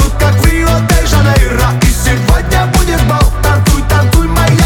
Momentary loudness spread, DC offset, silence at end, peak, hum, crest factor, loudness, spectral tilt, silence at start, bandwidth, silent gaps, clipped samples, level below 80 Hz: 2 LU; under 0.1%; 0 s; 0 dBFS; none; 8 dB; -10 LUFS; -5 dB/octave; 0 s; 18.5 kHz; none; under 0.1%; -12 dBFS